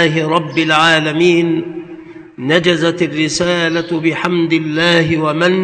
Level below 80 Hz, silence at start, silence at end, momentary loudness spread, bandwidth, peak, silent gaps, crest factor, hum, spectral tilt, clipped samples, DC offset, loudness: -52 dBFS; 0 s; 0 s; 9 LU; 11 kHz; 0 dBFS; none; 14 dB; none; -5 dB/octave; 0.1%; under 0.1%; -13 LUFS